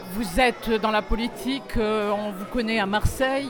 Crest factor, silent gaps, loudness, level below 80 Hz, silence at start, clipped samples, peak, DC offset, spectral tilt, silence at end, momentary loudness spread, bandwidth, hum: 16 dB; none; -24 LUFS; -34 dBFS; 0 s; under 0.1%; -8 dBFS; under 0.1%; -5 dB/octave; 0 s; 7 LU; over 20 kHz; none